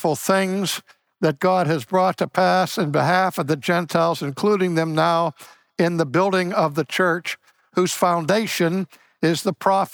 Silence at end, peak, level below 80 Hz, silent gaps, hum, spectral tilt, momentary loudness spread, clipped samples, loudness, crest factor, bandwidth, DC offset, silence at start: 0.05 s; -4 dBFS; -70 dBFS; none; none; -5 dB/octave; 6 LU; under 0.1%; -21 LUFS; 16 dB; over 20 kHz; under 0.1%; 0 s